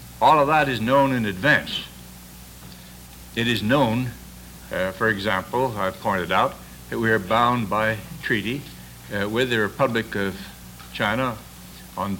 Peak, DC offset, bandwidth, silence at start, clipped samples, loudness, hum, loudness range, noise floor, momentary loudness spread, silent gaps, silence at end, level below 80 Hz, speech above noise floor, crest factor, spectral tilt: -4 dBFS; under 0.1%; 17 kHz; 0 s; under 0.1%; -22 LUFS; none; 3 LU; -42 dBFS; 22 LU; none; 0 s; -48 dBFS; 21 dB; 18 dB; -5.5 dB/octave